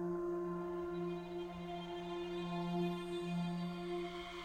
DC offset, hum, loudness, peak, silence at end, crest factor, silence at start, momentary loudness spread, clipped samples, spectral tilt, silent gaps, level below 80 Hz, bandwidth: under 0.1%; none; -42 LUFS; -28 dBFS; 0 s; 14 dB; 0 s; 6 LU; under 0.1%; -7 dB/octave; none; -64 dBFS; 12 kHz